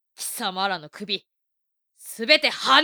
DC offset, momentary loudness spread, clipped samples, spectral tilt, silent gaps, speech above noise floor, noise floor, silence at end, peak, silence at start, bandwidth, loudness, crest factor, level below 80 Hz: under 0.1%; 15 LU; under 0.1%; -1.5 dB/octave; none; 56 dB; -79 dBFS; 0 s; -2 dBFS; 0.2 s; over 20 kHz; -22 LUFS; 22 dB; -78 dBFS